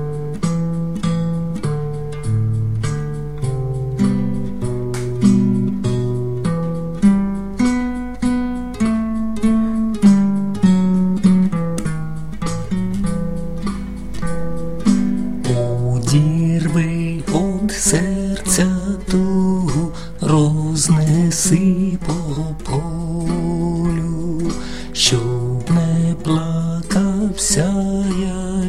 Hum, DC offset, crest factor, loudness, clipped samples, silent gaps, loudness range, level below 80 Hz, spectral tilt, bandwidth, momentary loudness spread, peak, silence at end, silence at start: none; 3%; 16 dB; -18 LUFS; under 0.1%; none; 5 LU; -32 dBFS; -5.5 dB/octave; 15 kHz; 10 LU; -2 dBFS; 0 s; 0 s